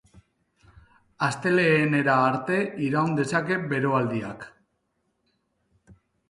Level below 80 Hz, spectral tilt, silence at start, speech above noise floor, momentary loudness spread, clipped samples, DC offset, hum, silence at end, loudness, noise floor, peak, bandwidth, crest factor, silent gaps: -64 dBFS; -6.5 dB/octave; 1.2 s; 51 dB; 10 LU; under 0.1%; under 0.1%; none; 0.35 s; -24 LUFS; -74 dBFS; -8 dBFS; 11.5 kHz; 18 dB; none